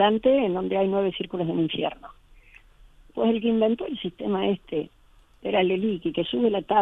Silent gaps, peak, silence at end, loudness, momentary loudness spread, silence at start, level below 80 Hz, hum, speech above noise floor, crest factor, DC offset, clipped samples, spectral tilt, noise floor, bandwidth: none; -8 dBFS; 0 s; -25 LUFS; 10 LU; 0 s; -56 dBFS; none; 29 dB; 16 dB; under 0.1%; under 0.1%; -8.5 dB/octave; -52 dBFS; 4 kHz